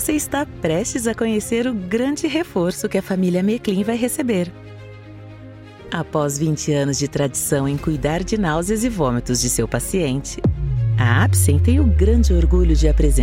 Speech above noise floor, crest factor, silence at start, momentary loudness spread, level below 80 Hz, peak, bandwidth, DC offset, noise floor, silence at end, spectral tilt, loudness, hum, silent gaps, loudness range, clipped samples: 20 dB; 16 dB; 0 s; 12 LU; -24 dBFS; -2 dBFS; 16.5 kHz; under 0.1%; -38 dBFS; 0 s; -5.5 dB/octave; -19 LUFS; none; none; 6 LU; under 0.1%